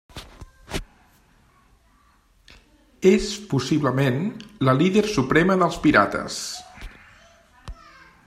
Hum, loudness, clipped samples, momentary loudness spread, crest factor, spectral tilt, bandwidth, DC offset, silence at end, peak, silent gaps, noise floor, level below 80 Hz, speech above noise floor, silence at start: none; -21 LUFS; under 0.1%; 24 LU; 22 dB; -5.5 dB/octave; 14.5 kHz; under 0.1%; 0.55 s; -2 dBFS; none; -59 dBFS; -46 dBFS; 39 dB; 0.15 s